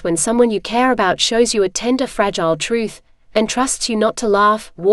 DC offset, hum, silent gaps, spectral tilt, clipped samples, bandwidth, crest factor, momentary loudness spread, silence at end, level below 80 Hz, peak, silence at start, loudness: under 0.1%; none; none; -3 dB/octave; under 0.1%; 13.5 kHz; 16 dB; 5 LU; 0 s; -44 dBFS; 0 dBFS; 0 s; -16 LUFS